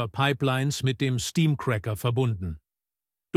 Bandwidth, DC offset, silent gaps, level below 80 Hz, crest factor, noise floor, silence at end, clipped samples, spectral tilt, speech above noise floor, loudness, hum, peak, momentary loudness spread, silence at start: 15.5 kHz; under 0.1%; none; -52 dBFS; 18 dB; under -90 dBFS; 0.8 s; under 0.1%; -5.5 dB/octave; over 64 dB; -26 LUFS; none; -8 dBFS; 7 LU; 0 s